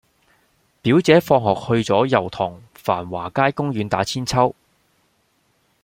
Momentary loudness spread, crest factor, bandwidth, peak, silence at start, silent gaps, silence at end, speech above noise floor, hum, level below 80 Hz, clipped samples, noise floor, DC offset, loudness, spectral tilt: 11 LU; 18 dB; 16.5 kHz; -2 dBFS; 0.85 s; none; 1.3 s; 46 dB; none; -52 dBFS; under 0.1%; -64 dBFS; under 0.1%; -19 LUFS; -6 dB/octave